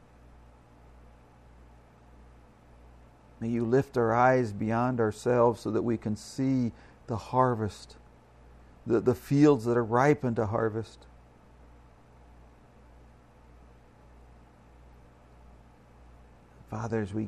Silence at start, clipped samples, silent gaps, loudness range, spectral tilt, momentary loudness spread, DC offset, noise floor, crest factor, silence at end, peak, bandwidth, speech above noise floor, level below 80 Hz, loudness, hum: 3.4 s; under 0.1%; none; 11 LU; -7.5 dB/octave; 15 LU; under 0.1%; -55 dBFS; 22 dB; 0 s; -10 dBFS; 14 kHz; 28 dB; -56 dBFS; -28 LUFS; 60 Hz at -55 dBFS